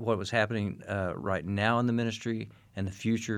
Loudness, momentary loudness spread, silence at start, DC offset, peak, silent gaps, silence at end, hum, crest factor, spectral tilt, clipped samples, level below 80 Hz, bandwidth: -31 LUFS; 10 LU; 0 s; under 0.1%; -10 dBFS; none; 0 s; none; 20 dB; -6 dB/octave; under 0.1%; -62 dBFS; 11.5 kHz